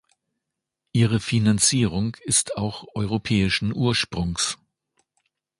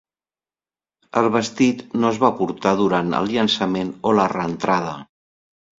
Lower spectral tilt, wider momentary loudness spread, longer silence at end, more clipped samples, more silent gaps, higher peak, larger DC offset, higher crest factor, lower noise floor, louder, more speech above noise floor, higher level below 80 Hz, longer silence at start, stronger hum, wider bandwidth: second, -4 dB/octave vs -5.5 dB/octave; first, 9 LU vs 5 LU; first, 1.05 s vs 0.75 s; neither; neither; about the same, -4 dBFS vs -2 dBFS; neither; about the same, 20 dB vs 20 dB; second, -83 dBFS vs under -90 dBFS; about the same, -22 LUFS vs -20 LUFS; second, 61 dB vs over 71 dB; first, -46 dBFS vs -58 dBFS; second, 0.95 s vs 1.15 s; neither; first, 11.5 kHz vs 7.8 kHz